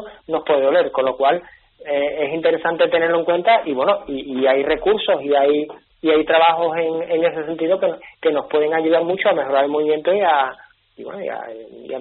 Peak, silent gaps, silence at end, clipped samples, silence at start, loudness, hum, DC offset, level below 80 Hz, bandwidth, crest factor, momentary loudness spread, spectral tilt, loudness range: -2 dBFS; none; 0 s; under 0.1%; 0 s; -18 LUFS; none; under 0.1%; -56 dBFS; 4.2 kHz; 16 dB; 12 LU; -2 dB/octave; 1 LU